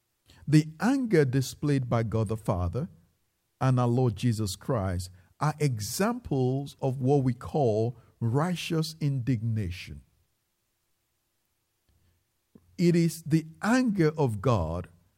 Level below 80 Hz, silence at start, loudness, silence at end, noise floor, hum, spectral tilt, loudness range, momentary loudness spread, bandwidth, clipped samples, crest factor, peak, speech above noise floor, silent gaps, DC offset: -54 dBFS; 0.45 s; -28 LUFS; 0.3 s; -77 dBFS; none; -7 dB/octave; 6 LU; 9 LU; 16 kHz; under 0.1%; 18 dB; -10 dBFS; 50 dB; none; under 0.1%